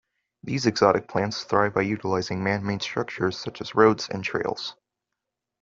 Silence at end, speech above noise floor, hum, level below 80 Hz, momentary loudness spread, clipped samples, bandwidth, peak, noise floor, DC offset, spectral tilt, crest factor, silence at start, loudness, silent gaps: 0.9 s; 60 dB; none; -62 dBFS; 10 LU; under 0.1%; 7.8 kHz; -2 dBFS; -84 dBFS; under 0.1%; -5.5 dB/octave; 22 dB; 0.45 s; -25 LUFS; none